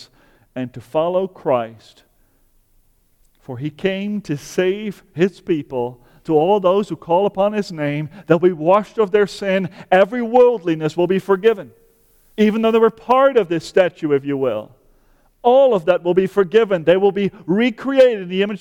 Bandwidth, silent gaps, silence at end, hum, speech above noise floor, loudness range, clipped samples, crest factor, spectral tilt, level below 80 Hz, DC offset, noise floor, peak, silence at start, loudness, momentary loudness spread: 13.5 kHz; none; 0.05 s; none; 41 dB; 9 LU; under 0.1%; 16 dB; -7 dB/octave; -56 dBFS; under 0.1%; -57 dBFS; -2 dBFS; 0 s; -17 LUFS; 12 LU